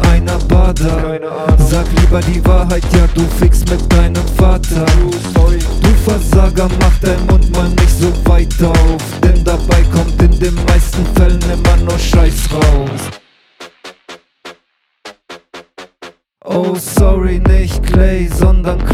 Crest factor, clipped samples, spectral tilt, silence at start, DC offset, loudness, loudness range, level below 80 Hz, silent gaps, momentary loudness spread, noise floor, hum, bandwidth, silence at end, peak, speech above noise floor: 10 dB; under 0.1%; -6 dB/octave; 0 s; under 0.1%; -12 LUFS; 7 LU; -12 dBFS; none; 5 LU; -59 dBFS; none; 15.5 kHz; 0 s; 0 dBFS; 50 dB